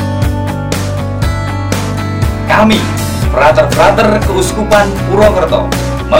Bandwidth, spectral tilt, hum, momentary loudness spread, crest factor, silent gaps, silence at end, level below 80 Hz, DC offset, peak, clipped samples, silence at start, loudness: 17 kHz; -5.5 dB/octave; none; 8 LU; 10 dB; none; 0 s; -22 dBFS; under 0.1%; 0 dBFS; 0.6%; 0 s; -11 LUFS